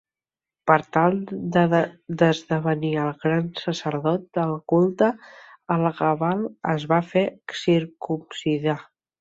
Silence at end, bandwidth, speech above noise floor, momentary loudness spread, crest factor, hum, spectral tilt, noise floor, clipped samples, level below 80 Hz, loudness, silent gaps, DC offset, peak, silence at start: 0.4 s; 7.8 kHz; over 68 dB; 8 LU; 20 dB; none; -7 dB/octave; under -90 dBFS; under 0.1%; -62 dBFS; -23 LUFS; none; under 0.1%; -2 dBFS; 0.65 s